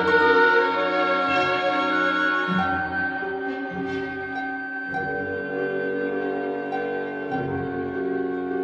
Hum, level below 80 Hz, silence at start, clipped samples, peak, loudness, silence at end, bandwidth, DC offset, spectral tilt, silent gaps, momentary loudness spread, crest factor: none; -58 dBFS; 0 s; under 0.1%; -6 dBFS; -24 LUFS; 0 s; 8 kHz; under 0.1%; -6 dB/octave; none; 10 LU; 18 dB